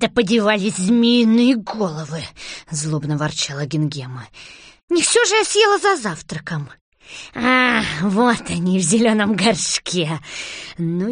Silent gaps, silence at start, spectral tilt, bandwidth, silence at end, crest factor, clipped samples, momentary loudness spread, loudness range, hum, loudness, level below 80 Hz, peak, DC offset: 4.83-4.88 s, 6.81-6.92 s; 0 s; -4 dB/octave; 10 kHz; 0 s; 16 dB; under 0.1%; 16 LU; 4 LU; none; -17 LUFS; -52 dBFS; -2 dBFS; under 0.1%